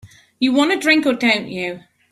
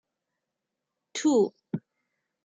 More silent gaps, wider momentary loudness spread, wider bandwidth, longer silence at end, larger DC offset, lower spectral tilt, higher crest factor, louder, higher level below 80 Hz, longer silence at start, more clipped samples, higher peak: neither; about the same, 12 LU vs 14 LU; first, 14 kHz vs 9.4 kHz; second, 0.3 s vs 0.65 s; neither; second, -3.5 dB/octave vs -5 dB/octave; about the same, 16 dB vs 18 dB; first, -17 LUFS vs -26 LUFS; first, -60 dBFS vs -82 dBFS; second, 0.05 s vs 1.15 s; neither; first, -2 dBFS vs -14 dBFS